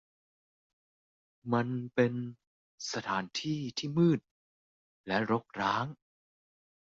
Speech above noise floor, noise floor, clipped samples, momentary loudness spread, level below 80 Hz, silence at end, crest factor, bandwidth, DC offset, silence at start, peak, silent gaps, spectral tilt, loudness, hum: over 58 dB; under -90 dBFS; under 0.1%; 12 LU; -72 dBFS; 1 s; 20 dB; 7.8 kHz; under 0.1%; 1.45 s; -14 dBFS; 2.47-2.78 s, 4.31-5.04 s; -5.5 dB/octave; -32 LUFS; none